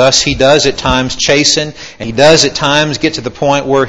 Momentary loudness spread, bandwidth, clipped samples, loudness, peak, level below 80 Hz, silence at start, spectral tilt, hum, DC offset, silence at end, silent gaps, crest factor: 8 LU; 11 kHz; 0.6%; -10 LUFS; 0 dBFS; -32 dBFS; 0 s; -3 dB/octave; none; 0.9%; 0 s; none; 10 dB